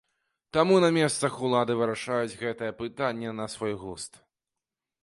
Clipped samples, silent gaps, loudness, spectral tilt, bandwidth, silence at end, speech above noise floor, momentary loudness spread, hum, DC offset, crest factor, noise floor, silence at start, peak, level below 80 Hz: under 0.1%; none; -27 LUFS; -5 dB/octave; 11.5 kHz; 0.95 s; 62 dB; 14 LU; none; under 0.1%; 20 dB; -89 dBFS; 0.55 s; -8 dBFS; -64 dBFS